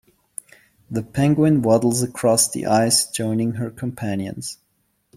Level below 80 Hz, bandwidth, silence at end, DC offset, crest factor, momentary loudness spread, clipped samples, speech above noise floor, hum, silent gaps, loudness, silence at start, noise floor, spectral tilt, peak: -56 dBFS; 16 kHz; 0.65 s; under 0.1%; 18 dB; 16 LU; under 0.1%; 44 dB; none; none; -20 LUFS; 0.9 s; -64 dBFS; -4.5 dB/octave; -4 dBFS